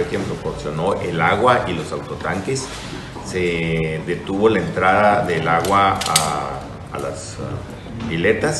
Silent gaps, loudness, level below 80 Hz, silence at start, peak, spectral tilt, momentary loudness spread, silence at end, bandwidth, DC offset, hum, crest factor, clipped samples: none; -19 LUFS; -42 dBFS; 0 s; 0 dBFS; -4.5 dB/octave; 14 LU; 0 s; 12.5 kHz; under 0.1%; none; 20 dB; under 0.1%